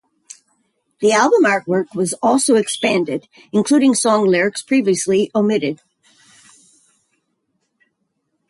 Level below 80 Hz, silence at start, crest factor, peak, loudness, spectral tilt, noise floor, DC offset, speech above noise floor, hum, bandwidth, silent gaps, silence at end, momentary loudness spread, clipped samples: -64 dBFS; 1 s; 16 dB; -2 dBFS; -16 LUFS; -4 dB/octave; -71 dBFS; under 0.1%; 55 dB; none; 11.5 kHz; none; 2.75 s; 8 LU; under 0.1%